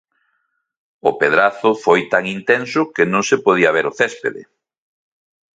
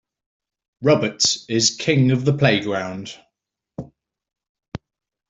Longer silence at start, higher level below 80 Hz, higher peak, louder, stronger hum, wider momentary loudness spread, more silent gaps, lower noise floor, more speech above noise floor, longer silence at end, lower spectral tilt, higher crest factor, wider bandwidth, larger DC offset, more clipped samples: first, 1.05 s vs 0.8 s; about the same, -62 dBFS vs -58 dBFS; about the same, 0 dBFS vs -2 dBFS; first, -16 LUFS vs -19 LUFS; neither; second, 6 LU vs 20 LU; second, none vs 4.49-4.55 s; second, -69 dBFS vs -79 dBFS; second, 53 dB vs 60 dB; first, 1.15 s vs 0.5 s; about the same, -4.5 dB/octave vs -4 dB/octave; about the same, 18 dB vs 20 dB; about the same, 9 kHz vs 8.2 kHz; neither; neither